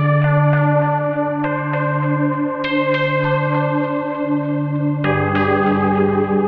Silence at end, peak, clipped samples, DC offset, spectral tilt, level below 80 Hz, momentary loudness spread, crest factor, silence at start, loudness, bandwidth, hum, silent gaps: 0 s; -4 dBFS; under 0.1%; under 0.1%; -10 dB/octave; -52 dBFS; 5 LU; 12 dB; 0 s; -18 LUFS; 4.9 kHz; none; none